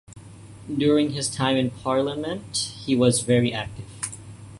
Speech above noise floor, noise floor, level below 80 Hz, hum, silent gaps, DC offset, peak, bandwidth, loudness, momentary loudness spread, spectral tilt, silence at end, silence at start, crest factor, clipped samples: 20 dB; -43 dBFS; -54 dBFS; none; none; under 0.1%; -4 dBFS; 11.5 kHz; -24 LUFS; 13 LU; -4.5 dB/octave; 0 s; 0.1 s; 20 dB; under 0.1%